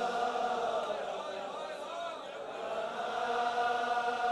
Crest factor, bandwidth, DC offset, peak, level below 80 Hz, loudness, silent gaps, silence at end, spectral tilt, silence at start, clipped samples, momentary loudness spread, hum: 14 dB; 12 kHz; under 0.1%; -20 dBFS; -74 dBFS; -35 LUFS; none; 0 s; -2.5 dB/octave; 0 s; under 0.1%; 9 LU; none